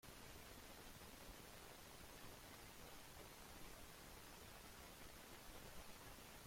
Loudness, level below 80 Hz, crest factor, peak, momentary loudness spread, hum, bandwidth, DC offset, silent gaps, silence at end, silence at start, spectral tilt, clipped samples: -59 LUFS; -68 dBFS; 16 dB; -44 dBFS; 1 LU; none; 16.5 kHz; under 0.1%; none; 0 s; 0.05 s; -3 dB/octave; under 0.1%